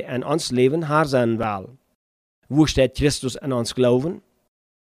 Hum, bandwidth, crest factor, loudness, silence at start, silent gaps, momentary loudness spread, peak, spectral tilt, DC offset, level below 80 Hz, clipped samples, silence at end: none; 15.5 kHz; 16 dB; -21 LUFS; 0 s; 1.95-2.42 s; 8 LU; -4 dBFS; -5.5 dB/octave; under 0.1%; -42 dBFS; under 0.1%; 0.75 s